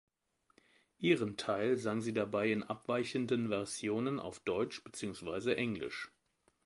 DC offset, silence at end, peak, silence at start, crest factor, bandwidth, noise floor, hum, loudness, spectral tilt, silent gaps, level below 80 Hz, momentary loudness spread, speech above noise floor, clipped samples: under 0.1%; 0.6 s; -16 dBFS; 1 s; 20 dB; 11.5 kHz; -78 dBFS; none; -36 LUFS; -5 dB/octave; none; -70 dBFS; 9 LU; 42 dB; under 0.1%